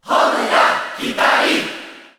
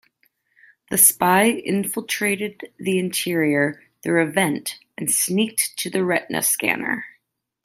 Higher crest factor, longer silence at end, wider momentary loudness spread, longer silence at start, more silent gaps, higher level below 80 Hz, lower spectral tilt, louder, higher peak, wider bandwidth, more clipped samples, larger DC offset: second, 16 dB vs 22 dB; second, 0.15 s vs 0.55 s; second, 10 LU vs 13 LU; second, 0.05 s vs 0.9 s; neither; about the same, -62 dBFS vs -66 dBFS; about the same, -2 dB/octave vs -3 dB/octave; first, -15 LUFS vs -20 LUFS; about the same, -2 dBFS vs 0 dBFS; first, over 20 kHz vs 16 kHz; neither; neither